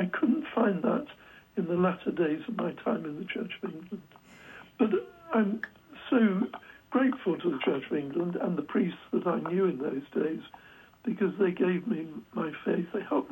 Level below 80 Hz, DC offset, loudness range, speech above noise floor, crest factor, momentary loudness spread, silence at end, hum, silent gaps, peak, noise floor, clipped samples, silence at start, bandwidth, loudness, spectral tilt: -72 dBFS; under 0.1%; 4 LU; 21 dB; 18 dB; 12 LU; 0 s; none; none; -12 dBFS; -51 dBFS; under 0.1%; 0 s; 16 kHz; -30 LUFS; -9 dB/octave